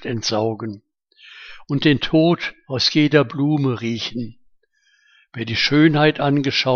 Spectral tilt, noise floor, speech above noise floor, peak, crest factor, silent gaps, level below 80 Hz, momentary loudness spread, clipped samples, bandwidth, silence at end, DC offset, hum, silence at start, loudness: -5.5 dB/octave; -61 dBFS; 43 dB; 0 dBFS; 18 dB; none; -50 dBFS; 19 LU; under 0.1%; 7 kHz; 0 s; under 0.1%; none; 0 s; -18 LUFS